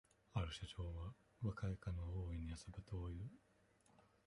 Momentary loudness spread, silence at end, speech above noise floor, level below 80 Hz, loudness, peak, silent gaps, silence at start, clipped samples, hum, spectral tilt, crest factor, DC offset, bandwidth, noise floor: 7 LU; 0.25 s; 27 dB; -56 dBFS; -49 LUFS; -28 dBFS; none; 0.35 s; under 0.1%; none; -6.5 dB/octave; 20 dB; under 0.1%; 11 kHz; -75 dBFS